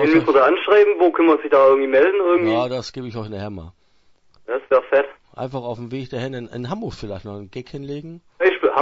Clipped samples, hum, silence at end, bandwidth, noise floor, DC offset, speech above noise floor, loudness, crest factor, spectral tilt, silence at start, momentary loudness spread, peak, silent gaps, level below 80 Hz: under 0.1%; none; 0 s; 7.6 kHz; -56 dBFS; under 0.1%; 37 dB; -18 LUFS; 16 dB; -7 dB/octave; 0 s; 18 LU; -2 dBFS; none; -54 dBFS